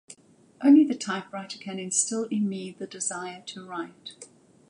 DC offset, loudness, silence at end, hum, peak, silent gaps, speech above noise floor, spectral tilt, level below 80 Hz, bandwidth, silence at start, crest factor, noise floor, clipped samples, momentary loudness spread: under 0.1%; -26 LUFS; 0.45 s; none; -8 dBFS; none; 26 dB; -3.5 dB/octave; -82 dBFS; 11.5 kHz; 0.1 s; 18 dB; -52 dBFS; under 0.1%; 19 LU